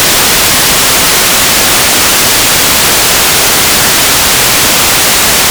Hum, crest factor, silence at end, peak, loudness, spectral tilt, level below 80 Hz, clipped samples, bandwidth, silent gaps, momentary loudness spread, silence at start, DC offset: none; 6 dB; 0 s; 0 dBFS; -4 LUFS; -0.5 dB/octave; -28 dBFS; 9%; over 20 kHz; none; 0 LU; 0 s; under 0.1%